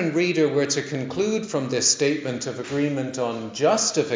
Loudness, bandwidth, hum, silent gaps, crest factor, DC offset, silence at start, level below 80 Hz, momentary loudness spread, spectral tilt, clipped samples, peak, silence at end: -23 LUFS; 7.8 kHz; none; none; 16 dB; under 0.1%; 0 s; -64 dBFS; 8 LU; -3.5 dB/octave; under 0.1%; -6 dBFS; 0 s